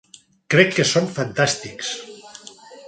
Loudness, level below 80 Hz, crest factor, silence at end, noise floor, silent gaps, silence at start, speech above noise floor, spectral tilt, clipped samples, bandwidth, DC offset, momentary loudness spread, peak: -19 LUFS; -60 dBFS; 22 dB; 0 s; -43 dBFS; none; 0.5 s; 23 dB; -4 dB/octave; under 0.1%; 9.4 kHz; under 0.1%; 23 LU; 0 dBFS